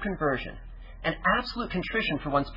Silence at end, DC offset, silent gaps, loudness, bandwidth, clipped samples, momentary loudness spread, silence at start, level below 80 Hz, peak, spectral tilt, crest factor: 0 s; under 0.1%; none; -28 LUFS; 5.8 kHz; under 0.1%; 14 LU; 0 s; -44 dBFS; -12 dBFS; -7 dB/octave; 18 dB